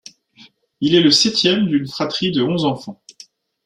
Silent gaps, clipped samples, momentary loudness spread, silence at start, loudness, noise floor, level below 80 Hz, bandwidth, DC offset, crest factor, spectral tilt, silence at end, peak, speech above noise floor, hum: none; under 0.1%; 11 LU; 0.8 s; -16 LUFS; -49 dBFS; -58 dBFS; 12 kHz; under 0.1%; 18 dB; -4.5 dB/octave; 0.7 s; -2 dBFS; 33 dB; none